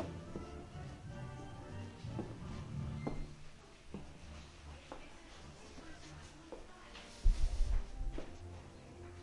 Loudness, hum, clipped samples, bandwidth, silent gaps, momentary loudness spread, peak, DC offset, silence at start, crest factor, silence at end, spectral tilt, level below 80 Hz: -47 LUFS; none; under 0.1%; 11 kHz; none; 14 LU; -18 dBFS; under 0.1%; 0 s; 24 dB; 0 s; -6 dB/octave; -42 dBFS